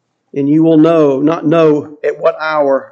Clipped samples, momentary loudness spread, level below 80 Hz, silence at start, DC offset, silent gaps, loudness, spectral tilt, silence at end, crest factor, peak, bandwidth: under 0.1%; 9 LU; -64 dBFS; 0.35 s; under 0.1%; none; -11 LUFS; -8.5 dB/octave; 0.05 s; 12 dB; 0 dBFS; 7 kHz